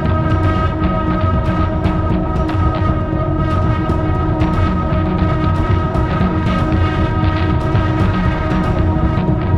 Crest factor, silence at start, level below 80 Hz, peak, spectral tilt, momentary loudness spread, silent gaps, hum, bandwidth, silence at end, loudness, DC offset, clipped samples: 12 dB; 0 s; -22 dBFS; -2 dBFS; -9 dB/octave; 2 LU; none; none; 6.6 kHz; 0 s; -16 LUFS; under 0.1%; under 0.1%